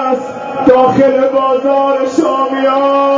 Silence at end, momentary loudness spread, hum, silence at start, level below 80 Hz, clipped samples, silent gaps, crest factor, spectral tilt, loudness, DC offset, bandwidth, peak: 0 s; 6 LU; none; 0 s; -50 dBFS; 0.1%; none; 10 dB; -6 dB/octave; -11 LUFS; under 0.1%; 7.8 kHz; 0 dBFS